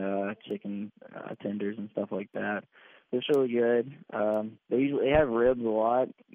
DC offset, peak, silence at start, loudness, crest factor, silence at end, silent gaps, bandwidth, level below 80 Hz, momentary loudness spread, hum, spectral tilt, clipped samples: under 0.1%; -12 dBFS; 0 s; -29 LUFS; 18 dB; 0.25 s; none; 7.4 kHz; -54 dBFS; 13 LU; none; -5 dB/octave; under 0.1%